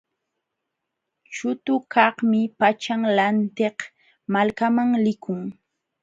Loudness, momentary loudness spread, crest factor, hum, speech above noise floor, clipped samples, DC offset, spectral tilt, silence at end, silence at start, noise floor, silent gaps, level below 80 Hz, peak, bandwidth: -22 LUFS; 15 LU; 22 dB; none; 60 dB; under 0.1%; under 0.1%; -6 dB/octave; 0.5 s; 1.3 s; -81 dBFS; none; -68 dBFS; 0 dBFS; 7.8 kHz